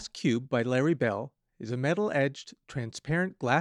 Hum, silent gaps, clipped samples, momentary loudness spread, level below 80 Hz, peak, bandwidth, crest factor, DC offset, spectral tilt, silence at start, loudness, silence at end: none; none; under 0.1%; 13 LU; -64 dBFS; -10 dBFS; 11 kHz; 20 dB; under 0.1%; -6 dB/octave; 0 s; -30 LUFS; 0 s